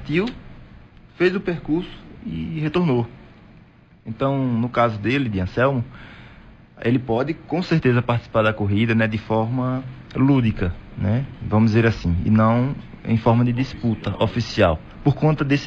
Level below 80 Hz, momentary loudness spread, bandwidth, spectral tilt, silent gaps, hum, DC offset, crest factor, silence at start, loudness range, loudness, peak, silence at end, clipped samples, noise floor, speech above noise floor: -42 dBFS; 11 LU; 7.2 kHz; -8 dB/octave; none; none; under 0.1%; 16 dB; 0 s; 5 LU; -21 LUFS; -4 dBFS; 0 s; under 0.1%; -49 dBFS; 29 dB